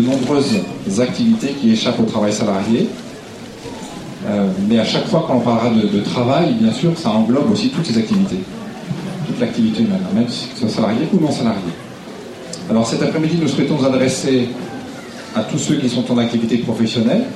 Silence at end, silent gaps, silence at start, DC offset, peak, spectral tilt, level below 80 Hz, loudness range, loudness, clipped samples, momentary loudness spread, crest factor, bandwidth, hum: 0 s; none; 0 s; under 0.1%; -2 dBFS; -6 dB/octave; -50 dBFS; 3 LU; -17 LUFS; under 0.1%; 15 LU; 14 dB; 12.5 kHz; none